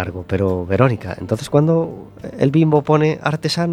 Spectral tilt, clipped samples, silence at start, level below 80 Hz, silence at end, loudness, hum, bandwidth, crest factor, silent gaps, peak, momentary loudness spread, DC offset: -7 dB/octave; under 0.1%; 0 s; -48 dBFS; 0 s; -18 LUFS; none; 13 kHz; 16 dB; none; 0 dBFS; 10 LU; under 0.1%